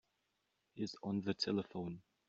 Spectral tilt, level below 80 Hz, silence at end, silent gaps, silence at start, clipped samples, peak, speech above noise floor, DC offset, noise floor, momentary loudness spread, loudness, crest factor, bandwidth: -5 dB/octave; -78 dBFS; 0.3 s; none; 0.75 s; under 0.1%; -22 dBFS; 43 dB; under 0.1%; -84 dBFS; 9 LU; -41 LUFS; 20 dB; 7.6 kHz